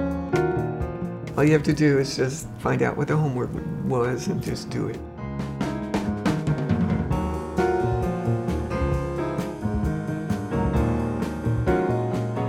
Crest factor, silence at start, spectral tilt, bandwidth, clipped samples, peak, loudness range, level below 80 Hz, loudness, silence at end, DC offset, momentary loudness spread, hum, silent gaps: 18 dB; 0 s; -7 dB/octave; 15.5 kHz; under 0.1%; -6 dBFS; 3 LU; -36 dBFS; -25 LUFS; 0 s; under 0.1%; 8 LU; none; none